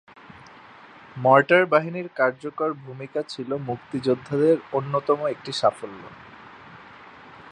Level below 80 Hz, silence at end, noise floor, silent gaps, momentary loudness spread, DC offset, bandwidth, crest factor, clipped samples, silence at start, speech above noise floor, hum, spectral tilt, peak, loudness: -66 dBFS; 0 s; -47 dBFS; none; 26 LU; under 0.1%; 10.5 kHz; 22 dB; under 0.1%; 1.15 s; 24 dB; none; -6 dB/octave; -2 dBFS; -23 LUFS